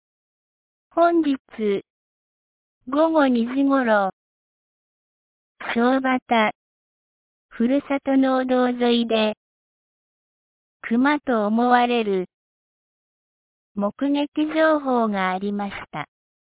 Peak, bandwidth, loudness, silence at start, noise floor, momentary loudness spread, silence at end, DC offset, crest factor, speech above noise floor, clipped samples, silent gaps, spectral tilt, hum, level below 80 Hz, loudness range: -4 dBFS; 4 kHz; -21 LUFS; 0.95 s; under -90 dBFS; 11 LU; 0.45 s; under 0.1%; 20 dB; over 70 dB; under 0.1%; 1.39-1.45 s, 1.90-2.81 s, 4.13-5.55 s, 6.22-6.26 s, 6.55-7.49 s, 9.37-10.80 s, 12.34-13.75 s, 14.28-14.32 s; -9.5 dB/octave; none; -64 dBFS; 2 LU